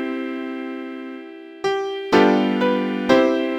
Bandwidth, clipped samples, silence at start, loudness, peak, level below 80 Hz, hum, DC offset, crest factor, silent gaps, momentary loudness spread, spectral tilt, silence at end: 9.8 kHz; under 0.1%; 0 s; -20 LUFS; 0 dBFS; -60 dBFS; none; under 0.1%; 20 dB; none; 17 LU; -6 dB/octave; 0 s